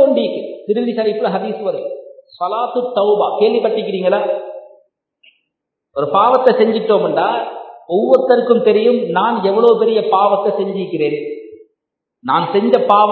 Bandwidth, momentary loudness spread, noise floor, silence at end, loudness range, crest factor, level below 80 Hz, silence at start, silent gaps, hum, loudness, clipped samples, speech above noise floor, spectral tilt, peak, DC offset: 4.5 kHz; 13 LU; -77 dBFS; 0 s; 4 LU; 16 dB; -70 dBFS; 0 s; none; none; -15 LUFS; under 0.1%; 63 dB; -8.5 dB/octave; 0 dBFS; under 0.1%